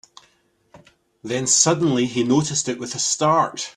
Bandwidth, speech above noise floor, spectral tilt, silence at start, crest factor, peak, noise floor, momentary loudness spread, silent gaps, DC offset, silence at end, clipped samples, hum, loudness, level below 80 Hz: 13 kHz; 42 dB; -3.5 dB/octave; 0.75 s; 20 dB; -2 dBFS; -62 dBFS; 10 LU; none; under 0.1%; 0.05 s; under 0.1%; none; -19 LUFS; -62 dBFS